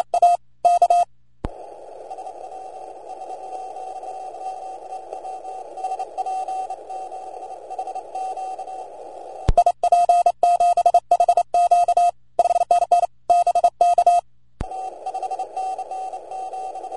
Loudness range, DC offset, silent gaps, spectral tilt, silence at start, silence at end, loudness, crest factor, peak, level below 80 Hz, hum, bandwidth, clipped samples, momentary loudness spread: 16 LU; 0.4%; none; -4.5 dB/octave; 0 s; 0 s; -20 LUFS; 16 dB; -4 dBFS; -40 dBFS; 60 Hz at -65 dBFS; 10 kHz; under 0.1%; 19 LU